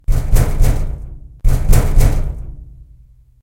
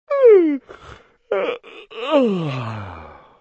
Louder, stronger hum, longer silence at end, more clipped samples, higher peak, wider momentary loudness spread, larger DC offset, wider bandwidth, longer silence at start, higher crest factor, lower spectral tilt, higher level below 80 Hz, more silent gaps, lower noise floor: about the same, -18 LUFS vs -18 LUFS; neither; first, 0.8 s vs 0.3 s; neither; first, 0 dBFS vs -4 dBFS; second, 17 LU vs 22 LU; neither; first, 16.5 kHz vs 7.4 kHz; about the same, 0.1 s vs 0.1 s; about the same, 14 dB vs 16 dB; second, -6 dB/octave vs -8 dB/octave; first, -14 dBFS vs -54 dBFS; neither; about the same, -45 dBFS vs -44 dBFS